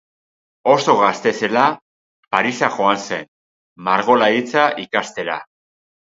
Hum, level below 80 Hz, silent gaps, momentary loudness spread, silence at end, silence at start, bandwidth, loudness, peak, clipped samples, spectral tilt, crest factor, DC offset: none; -66 dBFS; 1.82-2.23 s, 3.28-3.76 s; 12 LU; 0.6 s; 0.65 s; 7.8 kHz; -17 LUFS; 0 dBFS; under 0.1%; -4 dB/octave; 18 dB; under 0.1%